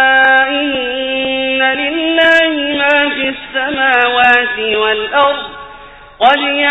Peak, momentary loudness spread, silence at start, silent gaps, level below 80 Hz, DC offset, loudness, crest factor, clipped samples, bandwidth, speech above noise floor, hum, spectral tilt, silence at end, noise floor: 0 dBFS; 8 LU; 0 s; none; -46 dBFS; under 0.1%; -11 LUFS; 12 dB; under 0.1%; 8.4 kHz; 22 dB; none; -4 dB/octave; 0 s; -35 dBFS